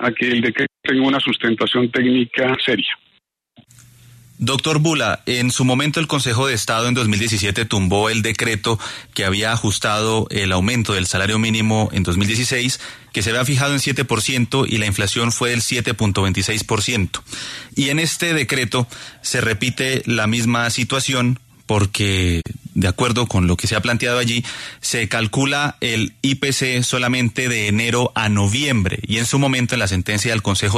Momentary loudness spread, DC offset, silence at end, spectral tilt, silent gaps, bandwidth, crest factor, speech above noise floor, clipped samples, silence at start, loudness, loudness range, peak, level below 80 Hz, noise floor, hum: 4 LU; under 0.1%; 0 s; -4 dB/octave; none; 13.5 kHz; 16 dB; 43 dB; under 0.1%; 0 s; -18 LUFS; 2 LU; -4 dBFS; -44 dBFS; -61 dBFS; none